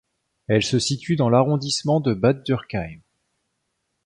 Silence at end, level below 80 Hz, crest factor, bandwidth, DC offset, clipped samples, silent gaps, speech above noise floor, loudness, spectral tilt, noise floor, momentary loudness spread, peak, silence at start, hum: 1.1 s; -52 dBFS; 18 dB; 11 kHz; under 0.1%; under 0.1%; none; 55 dB; -21 LUFS; -5.5 dB/octave; -75 dBFS; 12 LU; -4 dBFS; 0.5 s; none